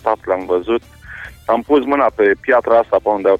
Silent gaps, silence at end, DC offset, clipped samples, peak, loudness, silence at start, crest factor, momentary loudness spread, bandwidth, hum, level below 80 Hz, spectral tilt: none; 0 s; under 0.1%; under 0.1%; -2 dBFS; -15 LUFS; 0.05 s; 14 dB; 16 LU; 8.4 kHz; none; -46 dBFS; -6.5 dB/octave